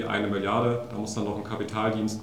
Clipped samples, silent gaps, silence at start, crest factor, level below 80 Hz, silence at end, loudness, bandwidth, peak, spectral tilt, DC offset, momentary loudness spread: under 0.1%; none; 0 s; 18 dB; -60 dBFS; 0 s; -28 LUFS; 15 kHz; -10 dBFS; -5.5 dB/octave; 0.2%; 7 LU